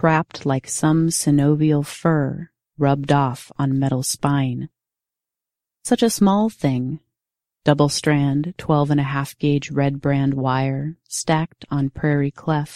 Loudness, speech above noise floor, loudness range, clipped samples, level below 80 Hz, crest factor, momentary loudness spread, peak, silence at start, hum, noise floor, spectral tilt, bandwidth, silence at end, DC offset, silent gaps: -20 LUFS; 68 dB; 3 LU; under 0.1%; -52 dBFS; 20 dB; 9 LU; 0 dBFS; 0 s; none; -87 dBFS; -6 dB/octave; 14.5 kHz; 0 s; under 0.1%; none